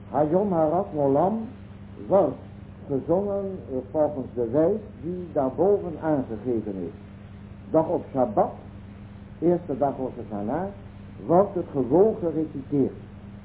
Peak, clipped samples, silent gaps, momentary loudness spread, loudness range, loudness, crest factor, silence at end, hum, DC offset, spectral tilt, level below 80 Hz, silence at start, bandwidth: -6 dBFS; under 0.1%; none; 21 LU; 3 LU; -25 LUFS; 18 dB; 0 s; none; under 0.1%; -13 dB/octave; -50 dBFS; 0 s; 4 kHz